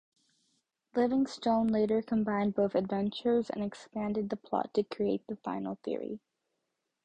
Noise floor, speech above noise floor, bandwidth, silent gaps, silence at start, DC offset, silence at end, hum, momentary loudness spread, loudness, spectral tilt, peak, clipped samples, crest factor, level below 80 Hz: -84 dBFS; 53 dB; 9.2 kHz; none; 0.95 s; under 0.1%; 0.85 s; none; 9 LU; -32 LUFS; -7 dB/octave; -16 dBFS; under 0.1%; 18 dB; -66 dBFS